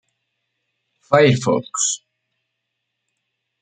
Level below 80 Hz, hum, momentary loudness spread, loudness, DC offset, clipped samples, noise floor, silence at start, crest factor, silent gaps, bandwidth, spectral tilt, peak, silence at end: -60 dBFS; none; 7 LU; -17 LUFS; under 0.1%; under 0.1%; -77 dBFS; 1.1 s; 20 dB; none; 9.6 kHz; -4 dB/octave; -2 dBFS; 1.65 s